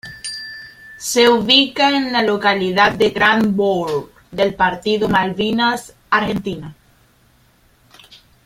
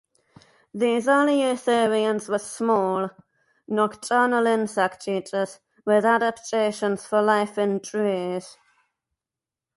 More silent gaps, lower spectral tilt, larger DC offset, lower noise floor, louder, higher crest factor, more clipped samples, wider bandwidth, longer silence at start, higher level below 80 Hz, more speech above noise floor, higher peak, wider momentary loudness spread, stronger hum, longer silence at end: neither; about the same, -4 dB/octave vs -4.5 dB/octave; neither; second, -54 dBFS vs -89 dBFS; first, -16 LUFS vs -23 LUFS; about the same, 18 dB vs 16 dB; neither; first, 16 kHz vs 11.5 kHz; second, 0.05 s vs 0.75 s; first, -50 dBFS vs -72 dBFS; second, 38 dB vs 67 dB; first, 0 dBFS vs -8 dBFS; first, 16 LU vs 9 LU; neither; first, 1.75 s vs 1.3 s